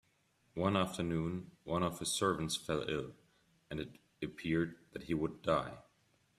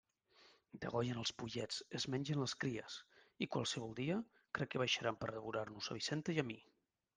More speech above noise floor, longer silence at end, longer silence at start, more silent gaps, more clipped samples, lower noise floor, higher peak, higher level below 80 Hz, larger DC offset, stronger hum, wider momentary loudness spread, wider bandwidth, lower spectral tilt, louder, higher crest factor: first, 38 dB vs 28 dB; about the same, 0.55 s vs 0.55 s; first, 0.55 s vs 0.4 s; neither; neither; first, -75 dBFS vs -70 dBFS; first, -16 dBFS vs -24 dBFS; first, -62 dBFS vs -76 dBFS; neither; neither; first, 14 LU vs 9 LU; first, 14.5 kHz vs 10 kHz; about the same, -5 dB/octave vs -4.5 dB/octave; first, -37 LUFS vs -42 LUFS; about the same, 22 dB vs 20 dB